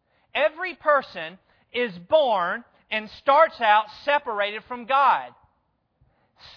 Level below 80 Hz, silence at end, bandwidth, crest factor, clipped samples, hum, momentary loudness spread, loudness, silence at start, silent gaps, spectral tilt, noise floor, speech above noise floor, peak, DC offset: -68 dBFS; 1.3 s; 5.4 kHz; 18 dB; under 0.1%; none; 15 LU; -23 LUFS; 0.35 s; none; -5 dB/octave; -71 dBFS; 48 dB; -6 dBFS; under 0.1%